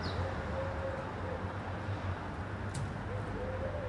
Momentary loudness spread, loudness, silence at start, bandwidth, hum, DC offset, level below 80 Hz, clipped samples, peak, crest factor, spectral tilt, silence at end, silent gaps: 2 LU; -39 LUFS; 0 s; 11.5 kHz; none; under 0.1%; -48 dBFS; under 0.1%; -24 dBFS; 14 dB; -6.5 dB/octave; 0 s; none